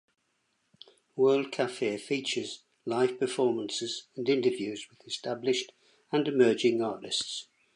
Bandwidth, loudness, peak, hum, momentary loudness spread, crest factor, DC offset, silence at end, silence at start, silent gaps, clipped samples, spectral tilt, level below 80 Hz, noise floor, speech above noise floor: 11 kHz; -30 LUFS; -10 dBFS; none; 13 LU; 20 dB; under 0.1%; 0.3 s; 1.15 s; none; under 0.1%; -4 dB/octave; -82 dBFS; -76 dBFS; 47 dB